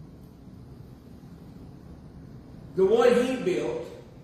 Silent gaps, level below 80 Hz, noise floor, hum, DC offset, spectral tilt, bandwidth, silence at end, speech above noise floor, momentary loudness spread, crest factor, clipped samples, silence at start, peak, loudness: none; -54 dBFS; -47 dBFS; none; under 0.1%; -6 dB/octave; 14 kHz; 0.05 s; 24 dB; 27 LU; 20 dB; under 0.1%; 0 s; -10 dBFS; -24 LUFS